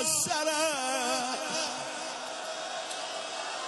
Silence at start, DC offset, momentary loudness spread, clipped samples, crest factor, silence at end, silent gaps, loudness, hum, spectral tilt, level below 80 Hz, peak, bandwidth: 0 s; under 0.1%; 9 LU; under 0.1%; 16 dB; 0 s; none; -31 LUFS; none; -0.5 dB/octave; -74 dBFS; -16 dBFS; 13 kHz